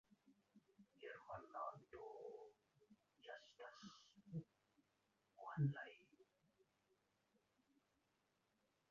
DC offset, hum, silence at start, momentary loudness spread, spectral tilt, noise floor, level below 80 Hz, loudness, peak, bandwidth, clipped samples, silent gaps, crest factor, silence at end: under 0.1%; none; 0.25 s; 18 LU; -6.5 dB/octave; -86 dBFS; -88 dBFS; -53 LUFS; -32 dBFS; 7.2 kHz; under 0.1%; none; 24 dB; 2.7 s